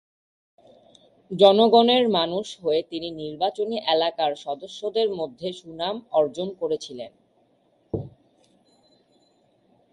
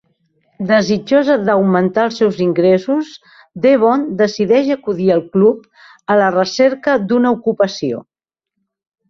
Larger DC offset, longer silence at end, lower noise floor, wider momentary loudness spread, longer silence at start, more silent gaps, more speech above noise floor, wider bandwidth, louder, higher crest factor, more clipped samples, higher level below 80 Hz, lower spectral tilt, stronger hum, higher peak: neither; first, 1.85 s vs 1.1 s; second, -64 dBFS vs -78 dBFS; first, 17 LU vs 7 LU; first, 1.3 s vs 0.6 s; neither; second, 41 dB vs 64 dB; first, 11 kHz vs 7.4 kHz; second, -23 LUFS vs -14 LUFS; first, 22 dB vs 14 dB; neither; about the same, -62 dBFS vs -58 dBFS; about the same, -5.5 dB/octave vs -6.5 dB/octave; neither; second, -4 dBFS vs 0 dBFS